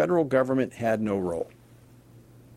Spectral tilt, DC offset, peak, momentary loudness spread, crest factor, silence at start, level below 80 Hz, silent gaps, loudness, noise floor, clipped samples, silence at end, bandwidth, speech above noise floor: -7.5 dB/octave; under 0.1%; -8 dBFS; 10 LU; 18 dB; 0 s; -60 dBFS; none; -26 LUFS; -53 dBFS; under 0.1%; 0 s; 14 kHz; 28 dB